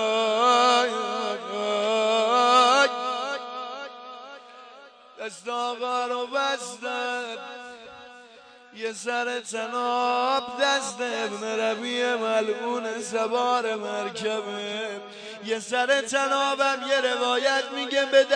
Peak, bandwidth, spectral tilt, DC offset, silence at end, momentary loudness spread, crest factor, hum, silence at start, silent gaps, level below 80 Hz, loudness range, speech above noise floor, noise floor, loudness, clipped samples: -6 dBFS; 10 kHz; -1.5 dB/octave; under 0.1%; 0 s; 17 LU; 20 dB; none; 0 s; none; -80 dBFS; 8 LU; 24 dB; -50 dBFS; -24 LUFS; under 0.1%